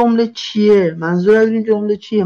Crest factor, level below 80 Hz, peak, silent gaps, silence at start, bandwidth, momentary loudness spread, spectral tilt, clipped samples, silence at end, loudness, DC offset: 10 dB; -58 dBFS; -4 dBFS; none; 0 s; 7 kHz; 5 LU; -7 dB/octave; under 0.1%; 0 s; -14 LUFS; under 0.1%